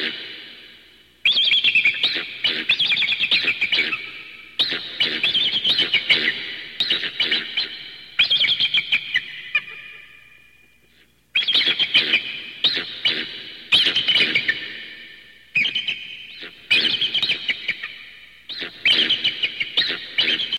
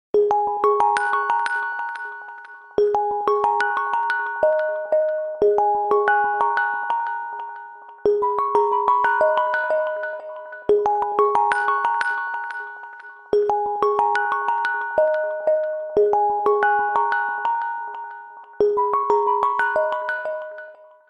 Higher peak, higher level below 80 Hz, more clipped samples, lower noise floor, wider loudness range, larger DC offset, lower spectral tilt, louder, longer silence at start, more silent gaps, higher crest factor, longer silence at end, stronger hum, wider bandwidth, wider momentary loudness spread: about the same, -4 dBFS vs -4 dBFS; about the same, -66 dBFS vs -62 dBFS; neither; first, -57 dBFS vs -42 dBFS; about the same, 4 LU vs 2 LU; first, 0.1% vs under 0.1%; second, -1.5 dB/octave vs -4 dB/octave; first, -18 LUFS vs -21 LUFS; second, 0 s vs 0.15 s; neither; about the same, 20 dB vs 16 dB; second, 0 s vs 0.35 s; neither; first, 16 kHz vs 9.8 kHz; first, 18 LU vs 14 LU